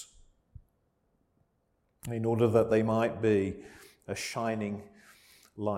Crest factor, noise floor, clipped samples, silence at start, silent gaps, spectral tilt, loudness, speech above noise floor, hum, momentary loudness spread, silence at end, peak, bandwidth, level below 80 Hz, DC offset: 20 dB; -75 dBFS; under 0.1%; 0 s; none; -6.5 dB/octave; -30 LUFS; 46 dB; none; 20 LU; 0 s; -12 dBFS; 16 kHz; -62 dBFS; under 0.1%